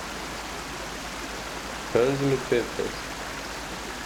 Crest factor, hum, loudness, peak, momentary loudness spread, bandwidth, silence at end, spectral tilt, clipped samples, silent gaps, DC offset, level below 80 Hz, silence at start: 20 dB; none; -29 LUFS; -10 dBFS; 10 LU; over 20 kHz; 0 s; -4 dB/octave; under 0.1%; none; under 0.1%; -46 dBFS; 0 s